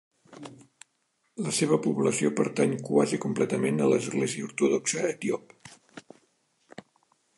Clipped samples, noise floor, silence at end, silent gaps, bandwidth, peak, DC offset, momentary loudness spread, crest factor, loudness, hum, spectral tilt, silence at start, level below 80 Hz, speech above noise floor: under 0.1%; -74 dBFS; 1.4 s; none; 11.5 kHz; -10 dBFS; under 0.1%; 21 LU; 20 dB; -27 LUFS; none; -5 dB/octave; 0.3 s; -76 dBFS; 47 dB